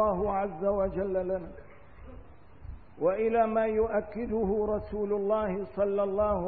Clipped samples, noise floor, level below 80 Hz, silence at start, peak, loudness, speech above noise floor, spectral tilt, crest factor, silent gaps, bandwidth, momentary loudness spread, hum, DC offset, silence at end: under 0.1%; -51 dBFS; -48 dBFS; 0 s; -14 dBFS; -29 LUFS; 23 dB; -11.5 dB/octave; 14 dB; none; 4.6 kHz; 8 LU; none; 0.3%; 0 s